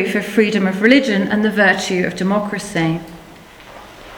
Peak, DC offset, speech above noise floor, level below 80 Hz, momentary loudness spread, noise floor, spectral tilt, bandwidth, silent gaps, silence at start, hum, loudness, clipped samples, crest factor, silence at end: 0 dBFS; under 0.1%; 24 dB; -50 dBFS; 9 LU; -40 dBFS; -5.5 dB/octave; 18 kHz; none; 0 s; none; -16 LUFS; under 0.1%; 18 dB; 0 s